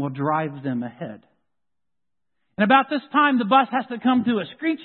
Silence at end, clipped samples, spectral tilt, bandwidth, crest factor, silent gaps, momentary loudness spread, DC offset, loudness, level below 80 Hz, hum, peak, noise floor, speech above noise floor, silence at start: 0 s; under 0.1%; -10.5 dB/octave; 4.4 kHz; 18 dB; none; 14 LU; under 0.1%; -21 LUFS; -70 dBFS; none; -4 dBFS; -86 dBFS; 65 dB; 0 s